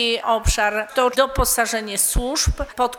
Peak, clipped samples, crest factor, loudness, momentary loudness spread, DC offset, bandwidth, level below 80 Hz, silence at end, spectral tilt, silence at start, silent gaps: -4 dBFS; under 0.1%; 16 dB; -19 LUFS; 3 LU; under 0.1%; over 20 kHz; -28 dBFS; 0 s; -2.5 dB/octave; 0 s; none